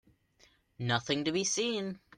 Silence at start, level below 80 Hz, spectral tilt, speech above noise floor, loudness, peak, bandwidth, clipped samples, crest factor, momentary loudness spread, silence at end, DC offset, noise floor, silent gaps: 0.8 s; -70 dBFS; -3.5 dB/octave; 34 dB; -32 LUFS; -16 dBFS; 11 kHz; under 0.1%; 20 dB; 6 LU; 0.2 s; under 0.1%; -67 dBFS; none